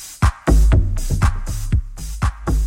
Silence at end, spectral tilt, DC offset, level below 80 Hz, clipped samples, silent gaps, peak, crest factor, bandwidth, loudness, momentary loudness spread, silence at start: 0 s; -6 dB/octave; under 0.1%; -18 dBFS; under 0.1%; none; -4 dBFS; 14 dB; 16 kHz; -20 LUFS; 8 LU; 0 s